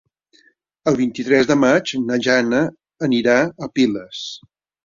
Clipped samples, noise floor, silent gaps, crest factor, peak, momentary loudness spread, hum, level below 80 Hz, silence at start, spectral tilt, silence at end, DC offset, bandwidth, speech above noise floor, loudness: under 0.1%; -57 dBFS; none; 18 dB; -2 dBFS; 13 LU; none; -58 dBFS; 0.85 s; -5 dB/octave; 0.5 s; under 0.1%; 7.6 kHz; 40 dB; -18 LUFS